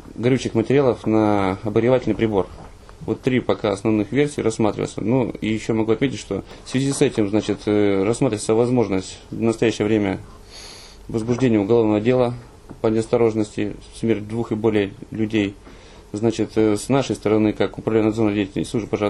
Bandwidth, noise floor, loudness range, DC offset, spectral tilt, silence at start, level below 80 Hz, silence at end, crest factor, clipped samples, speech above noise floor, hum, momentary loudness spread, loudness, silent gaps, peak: 12 kHz; -40 dBFS; 2 LU; under 0.1%; -6.5 dB/octave; 0.05 s; -46 dBFS; 0 s; 16 dB; under 0.1%; 20 dB; none; 10 LU; -21 LUFS; none; -4 dBFS